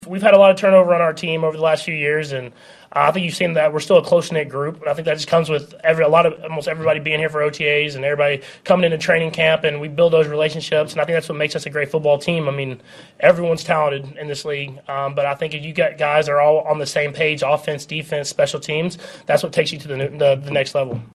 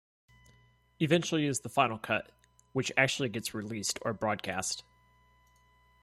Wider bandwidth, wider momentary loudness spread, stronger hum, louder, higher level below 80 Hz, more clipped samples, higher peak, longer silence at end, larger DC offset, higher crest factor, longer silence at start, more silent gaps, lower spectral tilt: second, 13 kHz vs 15.5 kHz; about the same, 11 LU vs 9 LU; second, none vs 60 Hz at -65 dBFS; first, -18 LUFS vs -31 LUFS; first, -60 dBFS vs -68 dBFS; neither; first, 0 dBFS vs -10 dBFS; second, 0.05 s vs 1.2 s; neither; second, 18 dB vs 24 dB; second, 0 s vs 1 s; neither; about the same, -5 dB/octave vs -4 dB/octave